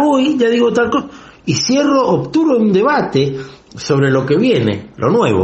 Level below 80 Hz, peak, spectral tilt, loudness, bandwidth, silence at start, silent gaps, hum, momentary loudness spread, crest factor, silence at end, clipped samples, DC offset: -50 dBFS; 0 dBFS; -5.5 dB/octave; -14 LUFS; 8.4 kHz; 0 s; none; none; 8 LU; 12 dB; 0 s; under 0.1%; under 0.1%